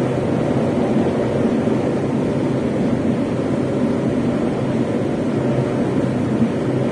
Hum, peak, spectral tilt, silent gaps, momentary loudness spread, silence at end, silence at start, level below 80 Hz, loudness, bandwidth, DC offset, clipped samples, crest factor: none; -4 dBFS; -8 dB/octave; none; 2 LU; 0 s; 0 s; -44 dBFS; -19 LUFS; 10.5 kHz; under 0.1%; under 0.1%; 14 dB